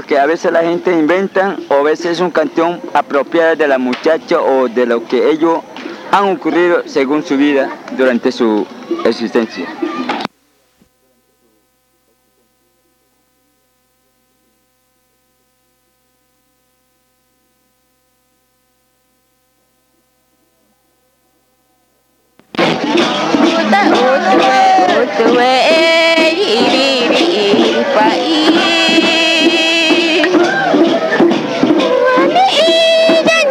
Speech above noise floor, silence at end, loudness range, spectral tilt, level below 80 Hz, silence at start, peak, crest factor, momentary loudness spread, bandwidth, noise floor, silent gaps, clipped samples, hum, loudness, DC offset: 46 dB; 0 s; 10 LU; -3.5 dB/octave; -64 dBFS; 0 s; 0 dBFS; 14 dB; 7 LU; 13 kHz; -59 dBFS; none; under 0.1%; none; -11 LUFS; under 0.1%